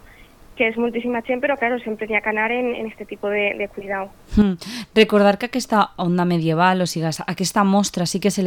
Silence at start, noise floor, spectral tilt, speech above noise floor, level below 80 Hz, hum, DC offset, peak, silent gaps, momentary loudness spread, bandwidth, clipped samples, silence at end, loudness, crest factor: 0.2 s; -46 dBFS; -5 dB/octave; 26 dB; -42 dBFS; none; under 0.1%; -4 dBFS; none; 9 LU; 18 kHz; under 0.1%; 0 s; -20 LUFS; 16 dB